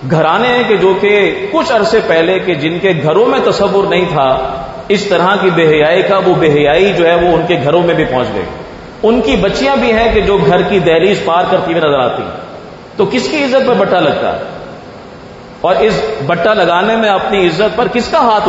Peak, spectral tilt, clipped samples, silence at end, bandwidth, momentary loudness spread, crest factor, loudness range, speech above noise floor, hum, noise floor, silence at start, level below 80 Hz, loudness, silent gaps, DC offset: 0 dBFS; -6 dB/octave; under 0.1%; 0 s; 8 kHz; 11 LU; 10 dB; 4 LU; 21 dB; none; -31 dBFS; 0 s; -36 dBFS; -11 LUFS; none; under 0.1%